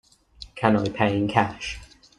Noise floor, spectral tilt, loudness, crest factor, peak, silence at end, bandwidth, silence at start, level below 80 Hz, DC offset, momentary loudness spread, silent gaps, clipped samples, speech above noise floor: -47 dBFS; -6 dB/octave; -24 LUFS; 22 dB; -2 dBFS; 0.35 s; 11 kHz; 0.4 s; -50 dBFS; under 0.1%; 18 LU; none; under 0.1%; 24 dB